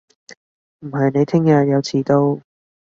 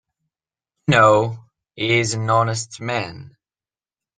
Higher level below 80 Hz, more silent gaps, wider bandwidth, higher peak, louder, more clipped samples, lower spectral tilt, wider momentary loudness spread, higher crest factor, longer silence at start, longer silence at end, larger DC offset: about the same, -58 dBFS vs -56 dBFS; first, 0.37-0.79 s vs none; second, 7.6 kHz vs 10 kHz; about the same, -2 dBFS vs -2 dBFS; about the same, -17 LUFS vs -19 LUFS; neither; first, -7.5 dB/octave vs -4.5 dB/octave; about the same, 13 LU vs 14 LU; about the same, 16 dB vs 20 dB; second, 0.3 s vs 0.9 s; second, 0.6 s vs 0.9 s; neither